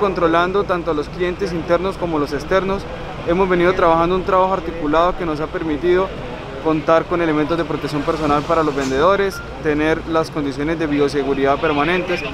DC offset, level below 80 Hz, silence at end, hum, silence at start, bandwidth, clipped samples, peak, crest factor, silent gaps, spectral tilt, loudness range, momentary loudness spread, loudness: under 0.1%; -36 dBFS; 0 s; none; 0 s; 14 kHz; under 0.1%; 0 dBFS; 18 dB; none; -6.5 dB/octave; 2 LU; 7 LU; -18 LUFS